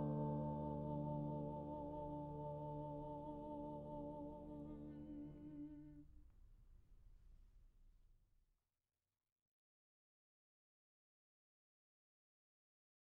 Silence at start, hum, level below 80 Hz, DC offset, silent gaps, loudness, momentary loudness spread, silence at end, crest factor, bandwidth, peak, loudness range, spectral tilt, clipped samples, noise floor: 0 s; none; -66 dBFS; under 0.1%; none; -49 LUFS; 10 LU; 5 s; 18 dB; 3.8 kHz; -32 dBFS; 14 LU; -11 dB/octave; under 0.1%; under -90 dBFS